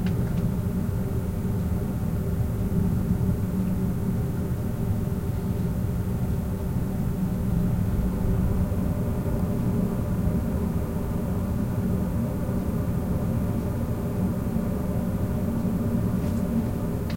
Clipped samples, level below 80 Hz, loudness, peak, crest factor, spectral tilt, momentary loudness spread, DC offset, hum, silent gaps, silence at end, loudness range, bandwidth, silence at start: under 0.1%; -34 dBFS; -27 LUFS; -10 dBFS; 14 dB; -8.5 dB/octave; 3 LU; under 0.1%; none; none; 0 s; 1 LU; 16.5 kHz; 0 s